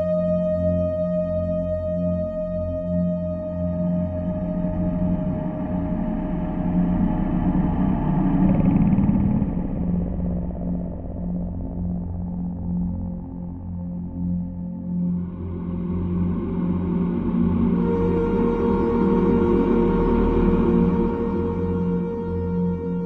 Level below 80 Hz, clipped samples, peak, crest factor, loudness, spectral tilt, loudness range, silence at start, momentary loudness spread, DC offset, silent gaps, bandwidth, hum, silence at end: -34 dBFS; under 0.1%; -6 dBFS; 16 dB; -23 LUFS; -12 dB/octave; 8 LU; 0 s; 10 LU; under 0.1%; none; 3.9 kHz; none; 0 s